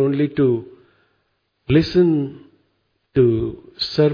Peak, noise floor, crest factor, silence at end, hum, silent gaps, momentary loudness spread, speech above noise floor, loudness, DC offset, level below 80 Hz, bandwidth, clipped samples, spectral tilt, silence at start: -4 dBFS; -69 dBFS; 16 dB; 0 s; none; none; 11 LU; 51 dB; -19 LUFS; under 0.1%; -46 dBFS; 5.2 kHz; under 0.1%; -8.5 dB/octave; 0 s